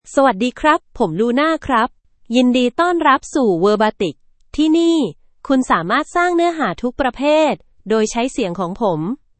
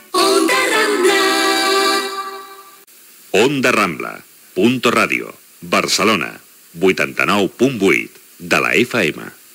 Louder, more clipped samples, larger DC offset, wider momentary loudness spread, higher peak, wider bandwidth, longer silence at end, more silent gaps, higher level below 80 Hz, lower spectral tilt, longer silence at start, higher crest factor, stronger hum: about the same, -17 LUFS vs -15 LUFS; neither; neither; second, 7 LU vs 14 LU; about the same, 0 dBFS vs 0 dBFS; second, 8.8 kHz vs 16.5 kHz; about the same, 0.25 s vs 0.25 s; neither; first, -46 dBFS vs -62 dBFS; first, -5 dB/octave vs -3 dB/octave; about the same, 0.05 s vs 0.15 s; about the same, 16 dB vs 16 dB; neither